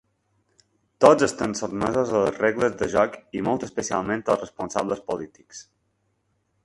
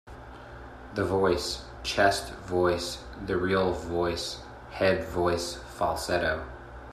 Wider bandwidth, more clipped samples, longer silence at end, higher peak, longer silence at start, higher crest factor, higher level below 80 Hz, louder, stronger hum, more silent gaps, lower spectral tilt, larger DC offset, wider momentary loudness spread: second, 11.5 kHz vs 15 kHz; neither; first, 1.05 s vs 0 s; first, 0 dBFS vs -8 dBFS; first, 1 s vs 0.05 s; about the same, 24 dB vs 20 dB; second, -56 dBFS vs -48 dBFS; first, -23 LUFS vs -28 LUFS; neither; neither; about the same, -5 dB/octave vs -4.5 dB/octave; neither; second, 14 LU vs 18 LU